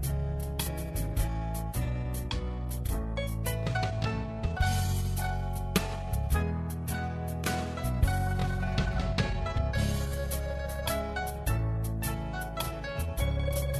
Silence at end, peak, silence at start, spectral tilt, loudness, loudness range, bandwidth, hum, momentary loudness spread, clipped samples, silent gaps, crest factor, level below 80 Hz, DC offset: 0 s; -12 dBFS; 0 s; -5.5 dB/octave; -32 LUFS; 2 LU; 13.5 kHz; none; 5 LU; under 0.1%; none; 18 dB; -34 dBFS; under 0.1%